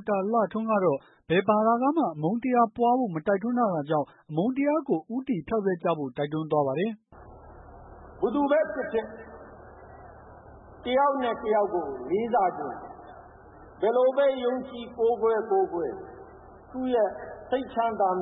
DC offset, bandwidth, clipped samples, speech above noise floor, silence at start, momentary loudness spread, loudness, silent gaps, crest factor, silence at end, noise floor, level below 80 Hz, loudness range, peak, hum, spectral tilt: under 0.1%; 4 kHz; under 0.1%; 24 dB; 0 s; 15 LU; -26 LUFS; none; 18 dB; 0 s; -49 dBFS; -58 dBFS; 5 LU; -10 dBFS; none; -11 dB/octave